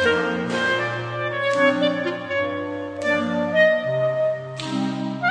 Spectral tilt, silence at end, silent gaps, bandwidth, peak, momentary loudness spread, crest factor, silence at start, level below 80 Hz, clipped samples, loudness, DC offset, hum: -5.5 dB/octave; 0 s; none; 10.5 kHz; -4 dBFS; 8 LU; 18 dB; 0 s; -60 dBFS; under 0.1%; -22 LUFS; under 0.1%; none